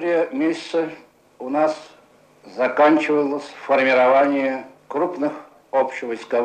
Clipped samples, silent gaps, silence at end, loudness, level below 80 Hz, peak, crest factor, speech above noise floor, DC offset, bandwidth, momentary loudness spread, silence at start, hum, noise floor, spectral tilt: under 0.1%; none; 0 s; -20 LUFS; -72 dBFS; -4 dBFS; 16 dB; 32 dB; under 0.1%; 9.4 kHz; 14 LU; 0 s; none; -52 dBFS; -5 dB/octave